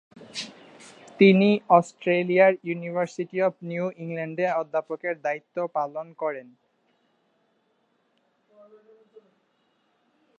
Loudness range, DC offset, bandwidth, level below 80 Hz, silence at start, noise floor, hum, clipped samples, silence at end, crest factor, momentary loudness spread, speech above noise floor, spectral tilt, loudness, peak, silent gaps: 14 LU; under 0.1%; 9.6 kHz; -78 dBFS; 0.2 s; -70 dBFS; none; under 0.1%; 4 s; 22 dB; 17 LU; 46 dB; -6.5 dB/octave; -24 LUFS; -4 dBFS; none